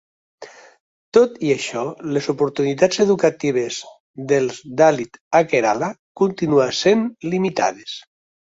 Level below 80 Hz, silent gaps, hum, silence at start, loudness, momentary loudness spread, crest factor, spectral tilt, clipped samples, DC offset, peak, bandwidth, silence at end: -62 dBFS; 0.80-1.12 s, 4.00-4.14 s, 5.21-5.31 s, 5.99-6.15 s; none; 0.4 s; -19 LUFS; 11 LU; 18 dB; -5 dB/octave; under 0.1%; under 0.1%; 0 dBFS; 8 kHz; 0.45 s